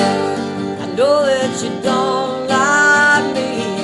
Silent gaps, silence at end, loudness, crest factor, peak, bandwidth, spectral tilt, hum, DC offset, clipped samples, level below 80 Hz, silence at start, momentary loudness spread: none; 0 s; -15 LUFS; 14 dB; -2 dBFS; 12 kHz; -3.5 dB/octave; none; under 0.1%; under 0.1%; -58 dBFS; 0 s; 10 LU